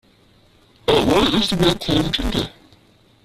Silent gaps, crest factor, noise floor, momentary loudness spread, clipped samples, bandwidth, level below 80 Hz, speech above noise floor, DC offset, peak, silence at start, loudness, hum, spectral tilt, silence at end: none; 18 dB; -54 dBFS; 9 LU; under 0.1%; 15.5 kHz; -34 dBFS; 35 dB; under 0.1%; -2 dBFS; 0.9 s; -18 LUFS; none; -5 dB/octave; 0.75 s